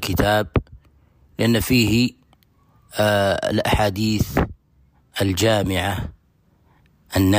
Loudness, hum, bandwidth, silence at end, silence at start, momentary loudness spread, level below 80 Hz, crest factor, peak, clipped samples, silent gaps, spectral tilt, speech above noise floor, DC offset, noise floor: -20 LUFS; none; 15.5 kHz; 0 s; 0 s; 11 LU; -36 dBFS; 14 dB; -6 dBFS; under 0.1%; none; -5 dB/octave; 40 dB; under 0.1%; -59 dBFS